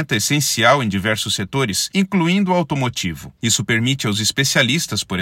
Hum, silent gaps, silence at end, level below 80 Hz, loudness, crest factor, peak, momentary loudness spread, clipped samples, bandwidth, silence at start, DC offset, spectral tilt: none; none; 0 s; -52 dBFS; -17 LUFS; 18 dB; 0 dBFS; 6 LU; under 0.1%; 16.5 kHz; 0 s; under 0.1%; -3.5 dB/octave